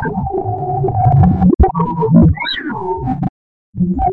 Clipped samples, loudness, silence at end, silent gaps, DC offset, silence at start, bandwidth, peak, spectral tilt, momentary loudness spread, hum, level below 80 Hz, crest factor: under 0.1%; -14 LUFS; 0 s; 3.30-3.73 s; under 0.1%; 0 s; 4.3 kHz; 0 dBFS; -10.5 dB/octave; 10 LU; none; -24 dBFS; 12 dB